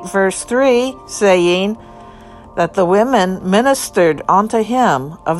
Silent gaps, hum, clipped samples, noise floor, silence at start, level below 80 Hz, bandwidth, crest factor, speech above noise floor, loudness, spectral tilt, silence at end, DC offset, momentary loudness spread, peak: none; none; under 0.1%; -37 dBFS; 0 s; -46 dBFS; 13 kHz; 14 dB; 23 dB; -14 LUFS; -4.5 dB/octave; 0 s; under 0.1%; 7 LU; 0 dBFS